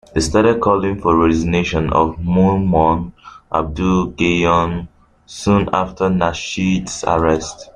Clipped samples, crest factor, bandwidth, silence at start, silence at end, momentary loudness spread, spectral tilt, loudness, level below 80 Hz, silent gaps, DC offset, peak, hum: under 0.1%; 14 dB; 10.5 kHz; 0.15 s; 0.05 s; 7 LU; -6 dB/octave; -16 LUFS; -34 dBFS; none; under 0.1%; -2 dBFS; none